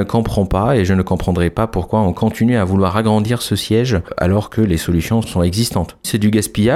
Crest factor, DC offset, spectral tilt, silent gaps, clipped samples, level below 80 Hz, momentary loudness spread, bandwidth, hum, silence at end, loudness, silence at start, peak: 12 dB; under 0.1%; -6 dB/octave; none; under 0.1%; -32 dBFS; 3 LU; 16 kHz; none; 0 s; -16 LUFS; 0 s; -2 dBFS